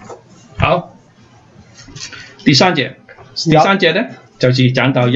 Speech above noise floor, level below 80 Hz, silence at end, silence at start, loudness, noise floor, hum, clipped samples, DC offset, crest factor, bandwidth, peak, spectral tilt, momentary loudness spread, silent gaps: 33 dB; -42 dBFS; 0 s; 0 s; -13 LUFS; -45 dBFS; none; under 0.1%; under 0.1%; 16 dB; 7.8 kHz; 0 dBFS; -5.5 dB/octave; 18 LU; none